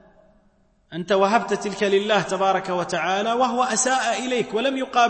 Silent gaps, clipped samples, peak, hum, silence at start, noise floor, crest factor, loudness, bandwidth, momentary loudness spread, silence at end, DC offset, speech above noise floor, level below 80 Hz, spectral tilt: none; under 0.1%; -6 dBFS; none; 0.9 s; -60 dBFS; 16 dB; -21 LUFS; 8.8 kHz; 5 LU; 0 s; under 0.1%; 39 dB; -62 dBFS; -3 dB/octave